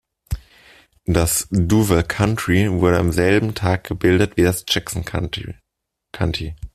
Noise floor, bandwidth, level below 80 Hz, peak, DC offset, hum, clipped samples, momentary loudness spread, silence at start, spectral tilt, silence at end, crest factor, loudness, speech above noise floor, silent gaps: -77 dBFS; 15 kHz; -36 dBFS; -2 dBFS; under 0.1%; none; under 0.1%; 15 LU; 0.3 s; -5 dB/octave; 0.05 s; 18 dB; -19 LUFS; 59 dB; none